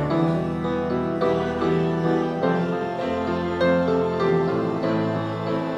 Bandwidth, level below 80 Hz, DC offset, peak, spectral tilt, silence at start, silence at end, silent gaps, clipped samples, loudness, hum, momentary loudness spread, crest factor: 8.4 kHz; -50 dBFS; under 0.1%; -8 dBFS; -8 dB/octave; 0 s; 0 s; none; under 0.1%; -23 LUFS; none; 5 LU; 14 dB